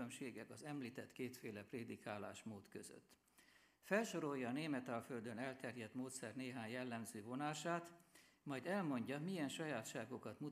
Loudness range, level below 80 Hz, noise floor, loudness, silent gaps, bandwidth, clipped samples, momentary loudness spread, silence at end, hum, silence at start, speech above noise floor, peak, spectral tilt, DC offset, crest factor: 6 LU; -90 dBFS; -72 dBFS; -48 LUFS; none; 15.5 kHz; under 0.1%; 12 LU; 0 s; none; 0 s; 25 dB; -24 dBFS; -5 dB/octave; under 0.1%; 24 dB